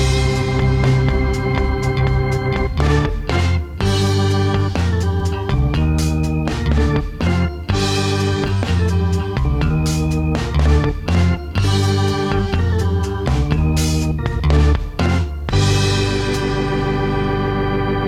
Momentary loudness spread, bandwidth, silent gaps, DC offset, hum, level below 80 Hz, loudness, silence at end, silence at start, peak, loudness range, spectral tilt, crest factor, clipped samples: 4 LU; 14 kHz; none; under 0.1%; none; -22 dBFS; -18 LUFS; 0 s; 0 s; 0 dBFS; 1 LU; -6 dB/octave; 16 dB; under 0.1%